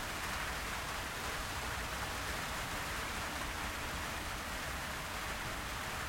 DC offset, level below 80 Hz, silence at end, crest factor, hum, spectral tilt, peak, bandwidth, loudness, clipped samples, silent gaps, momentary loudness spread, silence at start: under 0.1%; -50 dBFS; 0 s; 14 dB; none; -2.5 dB/octave; -26 dBFS; 16.5 kHz; -39 LUFS; under 0.1%; none; 1 LU; 0 s